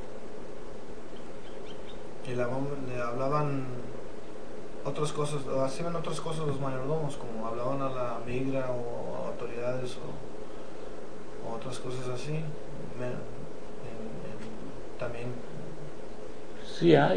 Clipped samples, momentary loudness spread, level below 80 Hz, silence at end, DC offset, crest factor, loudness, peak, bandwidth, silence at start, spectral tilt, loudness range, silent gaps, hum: under 0.1%; 13 LU; -56 dBFS; 0 s; 3%; 28 dB; -35 LUFS; -6 dBFS; 10 kHz; 0 s; -6.5 dB/octave; 7 LU; none; none